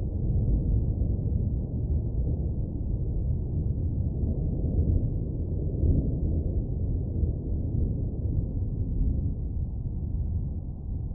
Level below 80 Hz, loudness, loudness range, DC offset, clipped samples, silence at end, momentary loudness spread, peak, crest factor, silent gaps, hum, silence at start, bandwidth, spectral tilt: -30 dBFS; -30 LUFS; 2 LU; under 0.1%; under 0.1%; 0 s; 6 LU; -12 dBFS; 14 dB; none; none; 0 s; 1.1 kHz; -14 dB/octave